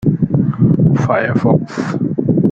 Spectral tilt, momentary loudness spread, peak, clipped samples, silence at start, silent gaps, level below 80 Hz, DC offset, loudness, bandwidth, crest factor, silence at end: -9 dB/octave; 6 LU; -2 dBFS; under 0.1%; 0 s; none; -40 dBFS; under 0.1%; -14 LUFS; 7.6 kHz; 12 dB; 0 s